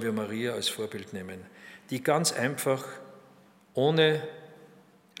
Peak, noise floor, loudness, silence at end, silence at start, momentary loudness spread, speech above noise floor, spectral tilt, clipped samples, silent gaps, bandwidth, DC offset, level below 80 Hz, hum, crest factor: -8 dBFS; -58 dBFS; -29 LUFS; 0.55 s; 0 s; 22 LU; 29 dB; -4 dB/octave; under 0.1%; none; 16 kHz; under 0.1%; -80 dBFS; none; 22 dB